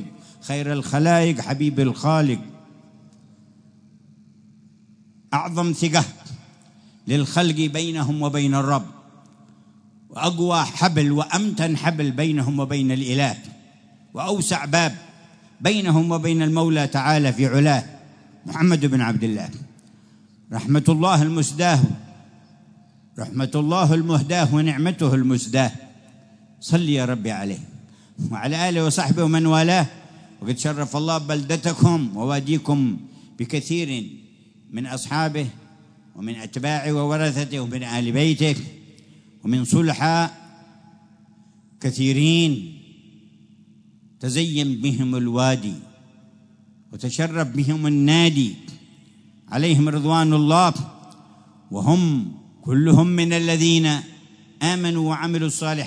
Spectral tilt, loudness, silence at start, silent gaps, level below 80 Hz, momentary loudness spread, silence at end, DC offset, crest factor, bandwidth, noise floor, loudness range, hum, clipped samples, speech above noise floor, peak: -5.5 dB/octave; -21 LUFS; 0 s; none; -64 dBFS; 15 LU; 0 s; under 0.1%; 20 dB; 11 kHz; -52 dBFS; 6 LU; none; under 0.1%; 33 dB; -2 dBFS